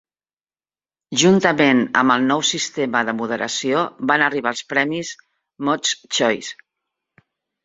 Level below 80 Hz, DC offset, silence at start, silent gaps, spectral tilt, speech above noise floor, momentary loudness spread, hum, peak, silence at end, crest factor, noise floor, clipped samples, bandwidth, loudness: -64 dBFS; under 0.1%; 1.1 s; none; -3.5 dB/octave; over 71 dB; 10 LU; none; 0 dBFS; 1.1 s; 20 dB; under -90 dBFS; under 0.1%; 8 kHz; -18 LUFS